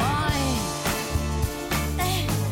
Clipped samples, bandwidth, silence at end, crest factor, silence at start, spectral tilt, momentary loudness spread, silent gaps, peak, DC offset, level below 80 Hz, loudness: under 0.1%; 17 kHz; 0 s; 12 dB; 0 s; -4.5 dB/octave; 3 LU; none; -14 dBFS; under 0.1%; -34 dBFS; -25 LUFS